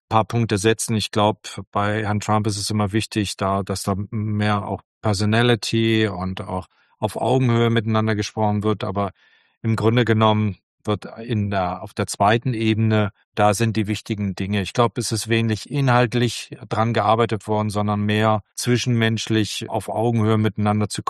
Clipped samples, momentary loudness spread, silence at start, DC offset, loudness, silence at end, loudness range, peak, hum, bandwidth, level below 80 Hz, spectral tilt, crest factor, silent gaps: under 0.1%; 9 LU; 0.1 s; under 0.1%; -21 LUFS; 0.05 s; 2 LU; -2 dBFS; none; 12.5 kHz; -54 dBFS; -5.5 dB/octave; 20 dB; 1.67-1.72 s, 4.85-5.01 s, 9.57-9.61 s, 10.63-10.78 s, 13.24-13.32 s